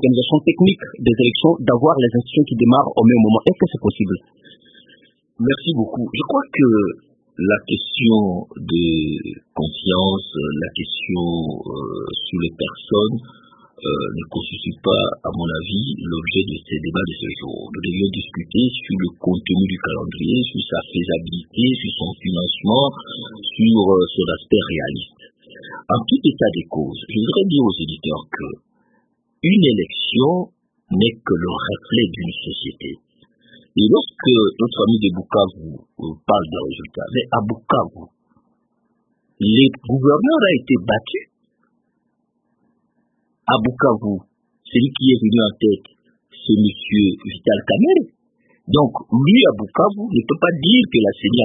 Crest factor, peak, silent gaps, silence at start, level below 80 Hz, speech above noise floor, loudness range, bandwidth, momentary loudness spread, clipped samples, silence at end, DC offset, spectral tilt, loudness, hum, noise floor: 18 dB; 0 dBFS; none; 0 s; -48 dBFS; 51 dB; 7 LU; 3.9 kHz; 13 LU; under 0.1%; 0 s; under 0.1%; -10.5 dB/octave; -18 LUFS; none; -68 dBFS